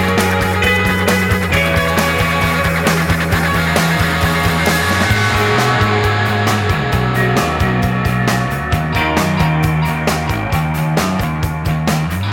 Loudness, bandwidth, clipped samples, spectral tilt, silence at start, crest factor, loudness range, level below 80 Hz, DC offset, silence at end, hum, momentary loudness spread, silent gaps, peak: -15 LUFS; 17.5 kHz; under 0.1%; -5 dB/octave; 0 s; 14 dB; 2 LU; -28 dBFS; under 0.1%; 0 s; none; 4 LU; none; 0 dBFS